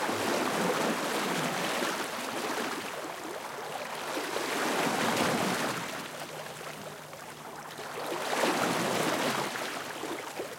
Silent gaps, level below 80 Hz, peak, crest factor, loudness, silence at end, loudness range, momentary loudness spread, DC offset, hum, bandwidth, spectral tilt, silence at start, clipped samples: none; -74 dBFS; -14 dBFS; 18 dB; -31 LUFS; 0 s; 3 LU; 12 LU; under 0.1%; none; 16.5 kHz; -3 dB/octave; 0 s; under 0.1%